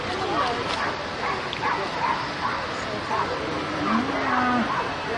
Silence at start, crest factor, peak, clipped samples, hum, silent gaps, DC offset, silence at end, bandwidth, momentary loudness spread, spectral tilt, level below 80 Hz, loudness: 0 s; 16 dB; -10 dBFS; under 0.1%; none; none; under 0.1%; 0 s; 11.5 kHz; 5 LU; -4.5 dB/octave; -50 dBFS; -25 LUFS